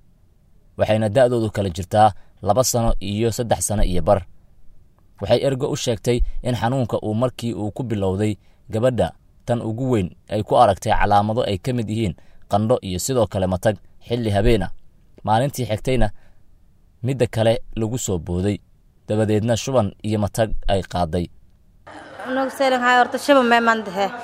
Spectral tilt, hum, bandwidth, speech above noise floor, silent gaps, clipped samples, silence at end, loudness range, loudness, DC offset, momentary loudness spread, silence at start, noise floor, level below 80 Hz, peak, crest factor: -5.5 dB/octave; none; 16 kHz; 34 dB; none; under 0.1%; 0 s; 4 LU; -21 LUFS; under 0.1%; 10 LU; 0.8 s; -53 dBFS; -32 dBFS; 0 dBFS; 20 dB